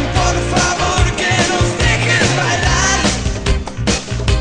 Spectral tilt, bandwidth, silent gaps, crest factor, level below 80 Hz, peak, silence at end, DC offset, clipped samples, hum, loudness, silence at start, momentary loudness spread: -3.5 dB/octave; 10 kHz; none; 14 dB; -22 dBFS; 0 dBFS; 0 s; under 0.1%; under 0.1%; none; -15 LUFS; 0 s; 6 LU